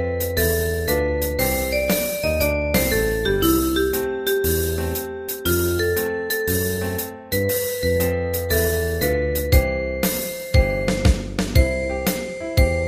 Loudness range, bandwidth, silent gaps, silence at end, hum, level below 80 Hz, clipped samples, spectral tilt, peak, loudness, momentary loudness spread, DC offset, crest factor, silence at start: 2 LU; 15.5 kHz; none; 0 s; none; -28 dBFS; under 0.1%; -4.5 dB/octave; -2 dBFS; -21 LUFS; 5 LU; under 0.1%; 18 dB; 0 s